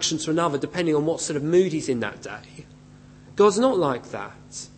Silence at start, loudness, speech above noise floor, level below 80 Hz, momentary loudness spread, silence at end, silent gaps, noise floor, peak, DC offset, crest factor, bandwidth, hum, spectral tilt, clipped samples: 0 s; -23 LUFS; 24 dB; -58 dBFS; 17 LU; 0.1 s; none; -48 dBFS; -6 dBFS; under 0.1%; 18 dB; 8.8 kHz; 50 Hz at -50 dBFS; -4.5 dB/octave; under 0.1%